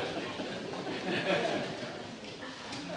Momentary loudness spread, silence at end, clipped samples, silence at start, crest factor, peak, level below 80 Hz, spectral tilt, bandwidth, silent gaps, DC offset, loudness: 12 LU; 0 s; under 0.1%; 0 s; 20 dB; -16 dBFS; -68 dBFS; -4.5 dB/octave; 10 kHz; none; under 0.1%; -36 LUFS